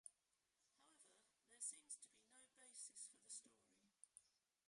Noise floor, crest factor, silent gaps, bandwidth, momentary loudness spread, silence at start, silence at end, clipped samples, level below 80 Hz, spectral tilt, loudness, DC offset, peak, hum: -89 dBFS; 24 dB; none; 11.5 kHz; 15 LU; 0.05 s; 0.4 s; under 0.1%; under -90 dBFS; 1.5 dB/octave; -57 LUFS; under 0.1%; -38 dBFS; none